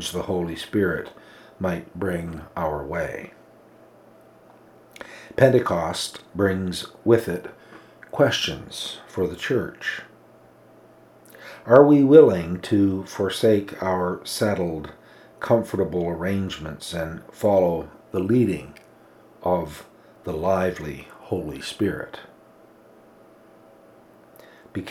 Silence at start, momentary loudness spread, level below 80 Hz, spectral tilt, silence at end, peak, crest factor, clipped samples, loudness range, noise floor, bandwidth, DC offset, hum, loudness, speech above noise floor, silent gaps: 0 s; 18 LU; -52 dBFS; -6 dB/octave; 0 s; 0 dBFS; 24 dB; under 0.1%; 13 LU; -52 dBFS; 16 kHz; under 0.1%; none; -23 LUFS; 30 dB; none